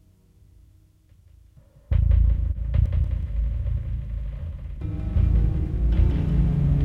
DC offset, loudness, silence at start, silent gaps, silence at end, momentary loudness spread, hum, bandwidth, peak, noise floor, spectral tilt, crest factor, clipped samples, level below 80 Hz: under 0.1%; -25 LUFS; 1.9 s; none; 0 s; 11 LU; none; 3.6 kHz; -8 dBFS; -55 dBFS; -10.5 dB/octave; 14 dB; under 0.1%; -24 dBFS